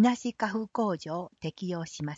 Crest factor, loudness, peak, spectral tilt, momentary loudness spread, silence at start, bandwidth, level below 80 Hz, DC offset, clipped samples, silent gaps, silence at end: 16 dB; -32 LUFS; -14 dBFS; -6 dB/octave; 7 LU; 0 s; 8 kHz; -68 dBFS; under 0.1%; under 0.1%; none; 0 s